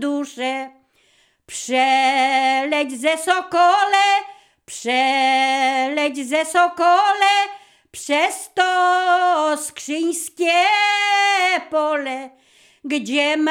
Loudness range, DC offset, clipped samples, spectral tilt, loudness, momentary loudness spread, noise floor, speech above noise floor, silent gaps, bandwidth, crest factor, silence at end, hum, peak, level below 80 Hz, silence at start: 2 LU; under 0.1%; under 0.1%; -0.5 dB/octave; -18 LUFS; 11 LU; -59 dBFS; 41 dB; none; 16.5 kHz; 16 dB; 0 s; none; -2 dBFS; -72 dBFS; 0 s